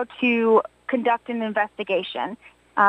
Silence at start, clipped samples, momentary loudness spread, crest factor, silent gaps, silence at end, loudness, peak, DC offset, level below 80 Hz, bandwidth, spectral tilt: 0 s; under 0.1%; 11 LU; 18 dB; none; 0 s; -23 LUFS; -4 dBFS; under 0.1%; -68 dBFS; 8.4 kHz; -6.5 dB/octave